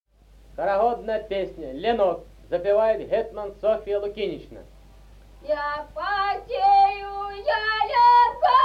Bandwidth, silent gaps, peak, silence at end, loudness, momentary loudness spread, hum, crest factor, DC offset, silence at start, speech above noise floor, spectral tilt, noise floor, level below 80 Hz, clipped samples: 7.6 kHz; none; -8 dBFS; 0 s; -23 LUFS; 13 LU; none; 16 dB; under 0.1%; 0.55 s; 30 dB; -5.5 dB/octave; -52 dBFS; -50 dBFS; under 0.1%